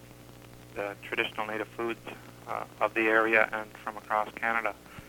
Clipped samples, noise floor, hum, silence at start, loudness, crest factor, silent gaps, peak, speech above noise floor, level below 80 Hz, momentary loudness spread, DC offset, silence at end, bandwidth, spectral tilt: under 0.1%; -50 dBFS; 60 Hz at -55 dBFS; 0 s; -30 LUFS; 24 dB; none; -8 dBFS; 19 dB; -62 dBFS; 20 LU; under 0.1%; 0 s; 18 kHz; -4.5 dB/octave